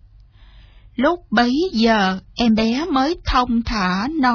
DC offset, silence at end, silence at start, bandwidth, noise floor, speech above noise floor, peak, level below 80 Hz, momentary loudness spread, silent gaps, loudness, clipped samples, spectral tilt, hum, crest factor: under 0.1%; 0 s; 1 s; 5.4 kHz; -46 dBFS; 28 dB; -4 dBFS; -36 dBFS; 4 LU; none; -18 LUFS; under 0.1%; -5.5 dB/octave; none; 16 dB